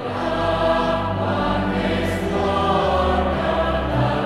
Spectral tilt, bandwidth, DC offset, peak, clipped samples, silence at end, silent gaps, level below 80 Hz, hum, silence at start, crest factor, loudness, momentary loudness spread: -7 dB/octave; 14 kHz; under 0.1%; -6 dBFS; under 0.1%; 0 s; none; -32 dBFS; none; 0 s; 14 dB; -20 LUFS; 3 LU